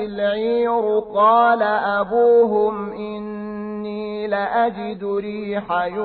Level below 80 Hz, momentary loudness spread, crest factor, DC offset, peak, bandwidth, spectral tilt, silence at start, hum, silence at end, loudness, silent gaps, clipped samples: -56 dBFS; 14 LU; 14 dB; under 0.1%; -6 dBFS; 4.6 kHz; -9.5 dB/octave; 0 s; none; 0 s; -20 LUFS; none; under 0.1%